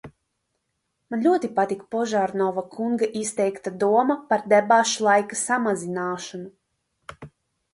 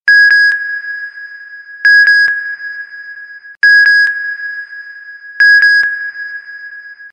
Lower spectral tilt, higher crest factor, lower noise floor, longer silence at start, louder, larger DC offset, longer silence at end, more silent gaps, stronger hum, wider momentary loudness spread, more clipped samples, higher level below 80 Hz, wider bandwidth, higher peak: first, -4 dB/octave vs 3 dB/octave; first, 18 dB vs 10 dB; first, -76 dBFS vs -32 dBFS; about the same, 0.05 s vs 0.05 s; second, -23 LUFS vs -8 LUFS; neither; first, 0.45 s vs 0.05 s; neither; neither; second, 13 LU vs 24 LU; neither; first, -66 dBFS vs -74 dBFS; first, 11.5 kHz vs 8.8 kHz; about the same, -4 dBFS vs -2 dBFS